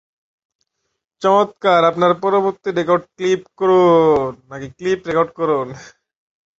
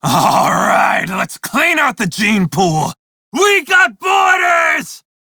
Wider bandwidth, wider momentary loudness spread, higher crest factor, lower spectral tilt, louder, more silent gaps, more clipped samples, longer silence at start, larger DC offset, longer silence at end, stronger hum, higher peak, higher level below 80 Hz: second, 7.8 kHz vs over 20 kHz; first, 13 LU vs 8 LU; about the same, 16 dB vs 14 dB; first, -6.5 dB/octave vs -3.5 dB/octave; second, -16 LUFS vs -13 LUFS; second, none vs 2.99-3.32 s; neither; first, 1.2 s vs 0.05 s; neither; first, 0.75 s vs 0.3 s; neither; about the same, -2 dBFS vs 0 dBFS; about the same, -54 dBFS vs -50 dBFS